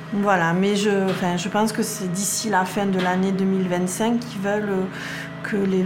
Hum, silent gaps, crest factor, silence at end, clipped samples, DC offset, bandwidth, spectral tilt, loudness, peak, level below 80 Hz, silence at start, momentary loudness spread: none; none; 18 dB; 0 s; under 0.1%; under 0.1%; 16.5 kHz; -5 dB/octave; -22 LUFS; -4 dBFS; -60 dBFS; 0 s; 6 LU